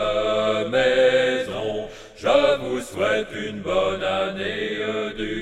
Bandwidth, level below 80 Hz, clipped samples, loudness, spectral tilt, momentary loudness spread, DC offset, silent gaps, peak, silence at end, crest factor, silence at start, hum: 12.5 kHz; -46 dBFS; under 0.1%; -22 LUFS; -4.5 dB/octave; 10 LU; under 0.1%; none; -4 dBFS; 0 s; 18 dB; 0 s; none